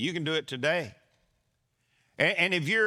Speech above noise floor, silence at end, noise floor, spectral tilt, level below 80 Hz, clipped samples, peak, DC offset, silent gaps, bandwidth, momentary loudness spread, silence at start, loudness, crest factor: 48 dB; 0 s; -75 dBFS; -4.5 dB/octave; -76 dBFS; under 0.1%; -10 dBFS; under 0.1%; none; 14.5 kHz; 7 LU; 0 s; -27 LUFS; 20 dB